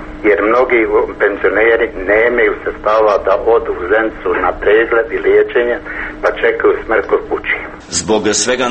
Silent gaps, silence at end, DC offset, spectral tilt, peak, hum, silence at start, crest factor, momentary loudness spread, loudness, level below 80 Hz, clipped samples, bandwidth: none; 0 s; under 0.1%; -3 dB/octave; 0 dBFS; none; 0 s; 14 dB; 6 LU; -13 LUFS; -36 dBFS; under 0.1%; 8.8 kHz